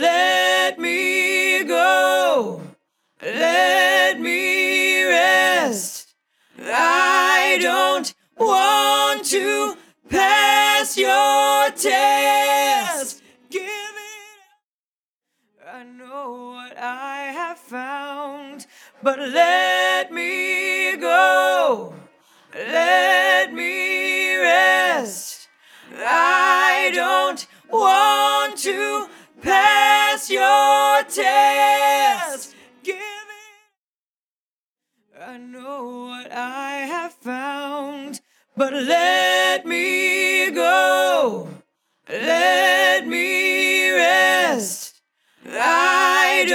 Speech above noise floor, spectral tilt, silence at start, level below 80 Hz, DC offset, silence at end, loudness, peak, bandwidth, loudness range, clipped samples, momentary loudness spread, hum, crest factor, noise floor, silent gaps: over 72 dB; -1 dB/octave; 0 s; -66 dBFS; under 0.1%; 0 s; -17 LUFS; 0 dBFS; 19 kHz; 15 LU; under 0.1%; 18 LU; none; 18 dB; under -90 dBFS; 14.64-15.21 s, 33.77-34.76 s